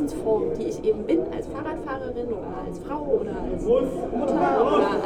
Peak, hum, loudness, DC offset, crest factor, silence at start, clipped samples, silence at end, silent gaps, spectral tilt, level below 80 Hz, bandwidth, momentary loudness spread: -8 dBFS; none; -25 LUFS; under 0.1%; 16 dB; 0 s; under 0.1%; 0 s; none; -7 dB/octave; -42 dBFS; 13 kHz; 11 LU